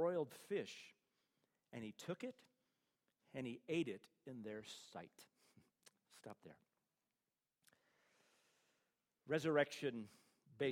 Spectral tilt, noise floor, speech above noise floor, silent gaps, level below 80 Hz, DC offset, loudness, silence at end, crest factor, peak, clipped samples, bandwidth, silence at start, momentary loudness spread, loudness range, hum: -5.5 dB/octave; under -90 dBFS; over 44 dB; none; -90 dBFS; under 0.1%; -46 LUFS; 0 s; 26 dB; -24 dBFS; under 0.1%; 16 kHz; 0 s; 21 LU; 21 LU; none